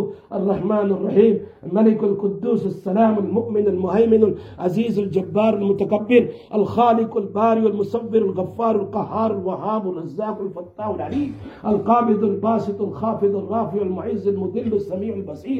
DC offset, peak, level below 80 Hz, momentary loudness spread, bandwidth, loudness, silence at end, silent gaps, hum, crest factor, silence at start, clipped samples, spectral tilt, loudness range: under 0.1%; -2 dBFS; -58 dBFS; 10 LU; 6.8 kHz; -20 LUFS; 0 s; none; none; 18 dB; 0 s; under 0.1%; -9.5 dB/octave; 4 LU